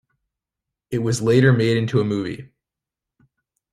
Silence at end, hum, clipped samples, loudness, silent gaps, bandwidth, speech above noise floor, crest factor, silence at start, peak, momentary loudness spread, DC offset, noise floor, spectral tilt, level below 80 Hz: 1.3 s; none; under 0.1%; -19 LUFS; none; 12 kHz; 68 dB; 20 dB; 0.9 s; -2 dBFS; 14 LU; under 0.1%; -87 dBFS; -6.5 dB/octave; -56 dBFS